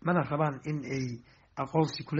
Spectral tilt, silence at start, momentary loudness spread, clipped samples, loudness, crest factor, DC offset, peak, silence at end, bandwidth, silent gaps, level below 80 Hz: -6 dB/octave; 0 s; 12 LU; under 0.1%; -32 LUFS; 18 dB; under 0.1%; -12 dBFS; 0 s; 7.6 kHz; none; -64 dBFS